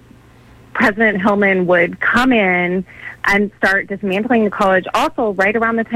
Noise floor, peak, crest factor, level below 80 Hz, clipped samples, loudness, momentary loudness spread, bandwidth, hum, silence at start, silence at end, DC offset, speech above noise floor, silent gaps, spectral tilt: -44 dBFS; -2 dBFS; 14 dB; -46 dBFS; under 0.1%; -15 LUFS; 7 LU; 15.5 kHz; none; 0.75 s; 0 s; under 0.1%; 29 dB; none; -6 dB/octave